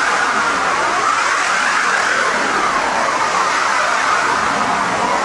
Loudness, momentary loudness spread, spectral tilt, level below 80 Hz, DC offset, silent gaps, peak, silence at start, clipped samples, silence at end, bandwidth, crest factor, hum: -15 LUFS; 2 LU; -1.5 dB/octave; -50 dBFS; under 0.1%; none; -2 dBFS; 0 s; under 0.1%; 0 s; 11.5 kHz; 14 dB; none